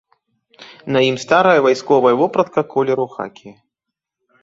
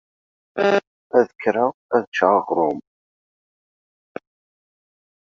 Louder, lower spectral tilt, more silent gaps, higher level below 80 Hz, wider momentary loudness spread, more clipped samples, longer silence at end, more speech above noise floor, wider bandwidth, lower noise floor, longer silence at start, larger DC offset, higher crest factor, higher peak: first, -15 LUFS vs -20 LUFS; about the same, -5.5 dB/octave vs -6 dB/octave; second, none vs 0.87-1.10 s, 1.35-1.39 s, 1.74-1.89 s, 2.07-2.12 s; first, -62 dBFS vs -70 dBFS; second, 14 LU vs 21 LU; neither; second, 0.9 s vs 2.5 s; second, 67 dB vs over 71 dB; about the same, 8 kHz vs 7.4 kHz; second, -82 dBFS vs under -90 dBFS; about the same, 0.6 s vs 0.55 s; neither; second, 16 dB vs 22 dB; about the same, -2 dBFS vs -2 dBFS